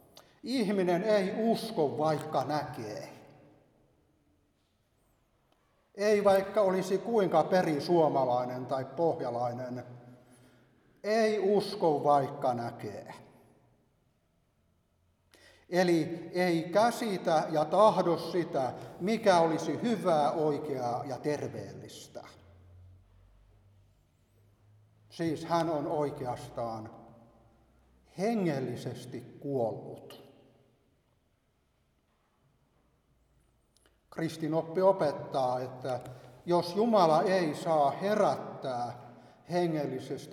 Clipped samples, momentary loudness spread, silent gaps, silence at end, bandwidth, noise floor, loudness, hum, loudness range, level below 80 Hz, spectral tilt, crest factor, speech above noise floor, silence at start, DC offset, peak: under 0.1%; 17 LU; none; 0 s; 17 kHz; -73 dBFS; -30 LUFS; none; 13 LU; -72 dBFS; -6 dB/octave; 20 dB; 43 dB; 0.15 s; under 0.1%; -12 dBFS